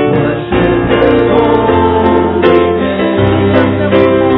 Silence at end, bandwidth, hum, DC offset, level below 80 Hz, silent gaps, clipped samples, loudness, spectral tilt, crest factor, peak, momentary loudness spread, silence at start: 0 s; 5.4 kHz; none; under 0.1%; -30 dBFS; none; 0.6%; -10 LUFS; -10 dB/octave; 10 dB; 0 dBFS; 3 LU; 0 s